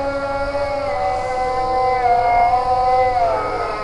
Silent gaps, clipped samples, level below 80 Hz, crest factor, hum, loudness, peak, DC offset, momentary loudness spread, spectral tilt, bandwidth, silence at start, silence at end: none; under 0.1%; -36 dBFS; 12 dB; none; -18 LUFS; -6 dBFS; under 0.1%; 6 LU; -5 dB/octave; 11 kHz; 0 s; 0 s